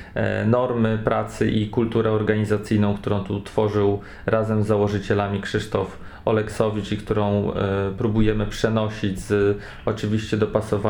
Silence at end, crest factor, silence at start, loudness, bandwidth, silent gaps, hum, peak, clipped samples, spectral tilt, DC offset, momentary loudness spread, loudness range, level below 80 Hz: 0 s; 18 dB; 0 s; -23 LUFS; 12 kHz; none; none; -4 dBFS; under 0.1%; -7 dB/octave; under 0.1%; 5 LU; 2 LU; -40 dBFS